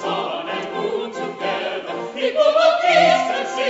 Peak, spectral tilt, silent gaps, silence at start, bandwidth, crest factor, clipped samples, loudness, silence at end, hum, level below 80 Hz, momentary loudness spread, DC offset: -4 dBFS; -3.5 dB/octave; none; 0 s; 8 kHz; 16 dB; under 0.1%; -19 LUFS; 0 s; none; -68 dBFS; 11 LU; under 0.1%